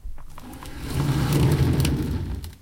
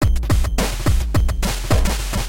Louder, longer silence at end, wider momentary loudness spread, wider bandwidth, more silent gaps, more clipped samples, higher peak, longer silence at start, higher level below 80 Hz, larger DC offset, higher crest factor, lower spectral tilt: second, -23 LUFS vs -20 LUFS; about the same, 0.05 s vs 0 s; first, 21 LU vs 2 LU; about the same, 17 kHz vs 17 kHz; neither; neither; about the same, -8 dBFS vs -6 dBFS; about the same, 0.05 s vs 0 s; second, -32 dBFS vs -20 dBFS; neither; about the same, 16 dB vs 12 dB; first, -6.5 dB/octave vs -5 dB/octave